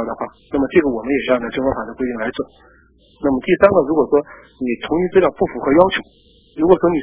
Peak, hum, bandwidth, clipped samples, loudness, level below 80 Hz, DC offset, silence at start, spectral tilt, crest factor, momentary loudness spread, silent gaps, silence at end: 0 dBFS; none; 4 kHz; under 0.1%; -17 LUFS; -44 dBFS; under 0.1%; 0 s; -10.5 dB/octave; 18 dB; 12 LU; none; 0 s